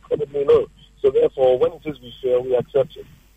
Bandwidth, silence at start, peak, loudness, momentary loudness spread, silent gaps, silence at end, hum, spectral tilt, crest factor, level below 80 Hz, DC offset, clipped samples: 8 kHz; 0.1 s; -6 dBFS; -20 LUFS; 12 LU; none; 0.35 s; none; -7.5 dB/octave; 14 dB; -50 dBFS; under 0.1%; under 0.1%